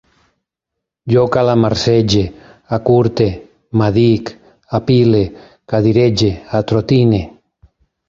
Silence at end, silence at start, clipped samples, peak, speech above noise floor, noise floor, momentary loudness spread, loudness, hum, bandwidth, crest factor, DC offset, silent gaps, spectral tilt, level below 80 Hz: 0.8 s; 1.05 s; under 0.1%; -2 dBFS; 67 dB; -79 dBFS; 10 LU; -14 LUFS; none; 7.6 kHz; 14 dB; under 0.1%; none; -7 dB/octave; -38 dBFS